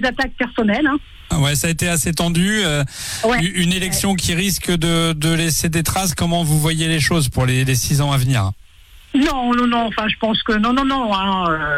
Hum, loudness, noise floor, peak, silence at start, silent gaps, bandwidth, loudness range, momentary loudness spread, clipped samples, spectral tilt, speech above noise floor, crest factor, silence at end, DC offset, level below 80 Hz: none; -17 LUFS; -44 dBFS; -6 dBFS; 0 s; none; 16 kHz; 1 LU; 3 LU; under 0.1%; -4 dB/octave; 26 dB; 12 dB; 0 s; under 0.1%; -34 dBFS